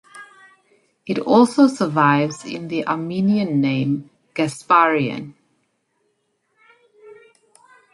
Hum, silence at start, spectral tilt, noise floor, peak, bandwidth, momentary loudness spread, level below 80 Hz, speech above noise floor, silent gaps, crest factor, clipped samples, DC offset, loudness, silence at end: none; 0.15 s; -6.5 dB/octave; -69 dBFS; -2 dBFS; 11.5 kHz; 14 LU; -66 dBFS; 51 dB; none; 18 dB; under 0.1%; under 0.1%; -18 LUFS; 0.8 s